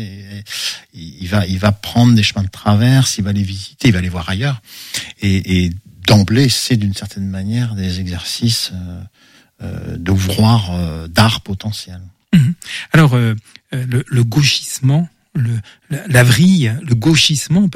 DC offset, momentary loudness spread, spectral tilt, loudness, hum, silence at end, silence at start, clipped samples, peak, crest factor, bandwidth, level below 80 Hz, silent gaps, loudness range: under 0.1%; 15 LU; -5 dB/octave; -15 LUFS; none; 0 s; 0 s; under 0.1%; 0 dBFS; 14 dB; 16 kHz; -40 dBFS; none; 4 LU